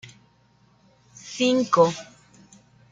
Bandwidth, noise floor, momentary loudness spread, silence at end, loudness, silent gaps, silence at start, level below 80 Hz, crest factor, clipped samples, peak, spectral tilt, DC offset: 9.2 kHz; -60 dBFS; 19 LU; 0.9 s; -21 LUFS; none; 1.25 s; -68 dBFS; 20 dB; under 0.1%; -6 dBFS; -4.5 dB/octave; under 0.1%